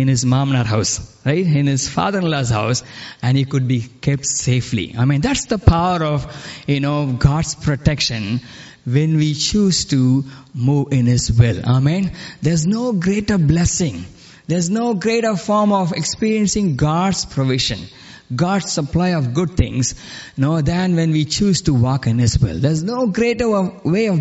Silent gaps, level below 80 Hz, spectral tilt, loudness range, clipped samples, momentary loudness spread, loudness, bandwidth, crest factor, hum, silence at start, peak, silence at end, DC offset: none; -34 dBFS; -5.5 dB/octave; 2 LU; under 0.1%; 7 LU; -17 LUFS; 8.2 kHz; 16 dB; none; 0 s; 0 dBFS; 0 s; under 0.1%